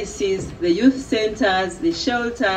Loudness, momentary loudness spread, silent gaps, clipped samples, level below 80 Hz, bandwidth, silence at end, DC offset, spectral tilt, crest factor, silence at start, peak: -20 LUFS; 6 LU; none; under 0.1%; -44 dBFS; 9.6 kHz; 0 s; under 0.1%; -4.5 dB/octave; 16 dB; 0 s; -4 dBFS